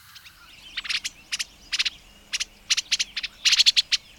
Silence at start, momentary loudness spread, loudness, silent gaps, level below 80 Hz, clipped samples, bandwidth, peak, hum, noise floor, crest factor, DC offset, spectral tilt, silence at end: 0.15 s; 14 LU; -23 LUFS; none; -58 dBFS; under 0.1%; 19 kHz; -4 dBFS; none; -48 dBFS; 22 dB; under 0.1%; 3.5 dB/octave; 0.2 s